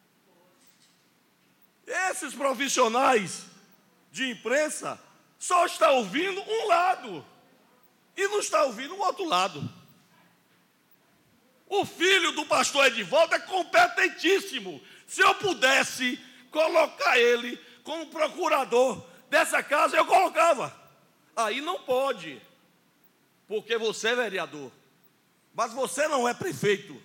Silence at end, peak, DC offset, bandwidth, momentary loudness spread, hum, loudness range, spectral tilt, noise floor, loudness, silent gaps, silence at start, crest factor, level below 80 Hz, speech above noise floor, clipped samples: 0.05 s; -8 dBFS; under 0.1%; 17 kHz; 16 LU; none; 7 LU; -2 dB/octave; -65 dBFS; -25 LUFS; none; 1.85 s; 18 dB; -82 dBFS; 40 dB; under 0.1%